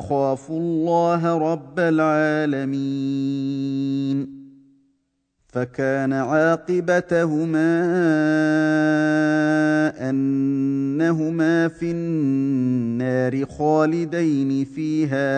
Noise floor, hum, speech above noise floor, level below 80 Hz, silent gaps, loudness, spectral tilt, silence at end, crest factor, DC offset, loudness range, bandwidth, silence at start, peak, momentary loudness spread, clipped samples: -70 dBFS; none; 50 dB; -60 dBFS; none; -21 LUFS; -7.5 dB/octave; 0 s; 14 dB; under 0.1%; 5 LU; 9.2 kHz; 0 s; -6 dBFS; 6 LU; under 0.1%